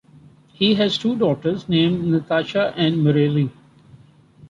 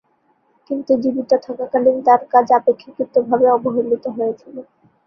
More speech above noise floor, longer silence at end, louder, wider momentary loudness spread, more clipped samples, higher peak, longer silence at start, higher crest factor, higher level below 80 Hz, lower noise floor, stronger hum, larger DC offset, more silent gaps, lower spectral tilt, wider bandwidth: second, 30 dB vs 45 dB; second, 0.05 s vs 0.45 s; about the same, -19 LUFS vs -17 LUFS; second, 5 LU vs 13 LU; neither; second, -6 dBFS vs -2 dBFS; about the same, 0.6 s vs 0.7 s; about the same, 16 dB vs 16 dB; first, -56 dBFS vs -64 dBFS; second, -49 dBFS vs -61 dBFS; neither; neither; neither; about the same, -7.5 dB/octave vs -7.5 dB/octave; first, 7.8 kHz vs 6.2 kHz